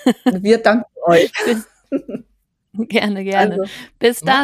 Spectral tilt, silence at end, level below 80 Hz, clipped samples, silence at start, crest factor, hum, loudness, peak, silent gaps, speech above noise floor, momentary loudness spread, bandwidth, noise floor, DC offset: -5 dB/octave; 0 s; -60 dBFS; under 0.1%; 0 s; 16 dB; none; -17 LUFS; 0 dBFS; none; 48 dB; 14 LU; 15 kHz; -64 dBFS; under 0.1%